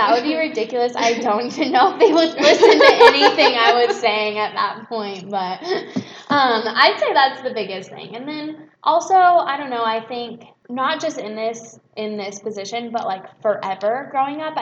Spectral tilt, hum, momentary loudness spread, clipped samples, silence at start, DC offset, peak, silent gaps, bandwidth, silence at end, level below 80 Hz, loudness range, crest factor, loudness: -3 dB/octave; none; 17 LU; under 0.1%; 0 s; under 0.1%; 0 dBFS; none; 9 kHz; 0 s; -68 dBFS; 12 LU; 18 dB; -17 LUFS